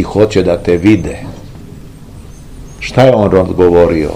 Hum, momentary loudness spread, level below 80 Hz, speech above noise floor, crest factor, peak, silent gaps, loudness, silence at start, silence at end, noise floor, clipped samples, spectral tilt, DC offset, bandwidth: none; 19 LU; -30 dBFS; 22 dB; 12 dB; 0 dBFS; none; -10 LUFS; 0 s; 0 s; -31 dBFS; 2%; -7.5 dB/octave; 0.8%; 14.5 kHz